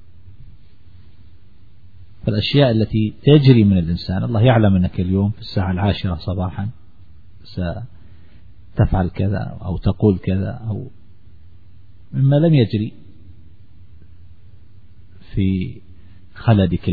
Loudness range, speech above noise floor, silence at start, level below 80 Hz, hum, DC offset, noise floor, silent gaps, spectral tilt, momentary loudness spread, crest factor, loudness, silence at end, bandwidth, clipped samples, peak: 10 LU; 32 dB; 0.25 s; -38 dBFS; none; 1%; -49 dBFS; none; -10 dB/octave; 15 LU; 20 dB; -18 LUFS; 0 s; 4.9 kHz; under 0.1%; 0 dBFS